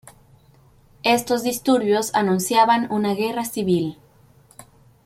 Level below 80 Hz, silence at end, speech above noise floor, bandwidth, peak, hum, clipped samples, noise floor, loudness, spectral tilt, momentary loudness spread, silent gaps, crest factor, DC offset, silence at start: -60 dBFS; 0.45 s; 34 dB; 16.5 kHz; -4 dBFS; none; under 0.1%; -53 dBFS; -20 LUFS; -4.5 dB/octave; 7 LU; none; 18 dB; under 0.1%; 0.05 s